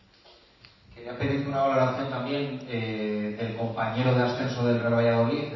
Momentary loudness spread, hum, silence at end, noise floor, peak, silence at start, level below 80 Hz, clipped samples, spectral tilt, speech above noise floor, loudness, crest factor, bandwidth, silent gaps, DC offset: 8 LU; none; 0 s; -56 dBFS; -12 dBFS; 0.9 s; -58 dBFS; under 0.1%; -7.5 dB/octave; 30 dB; -27 LUFS; 16 dB; 6 kHz; none; under 0.1%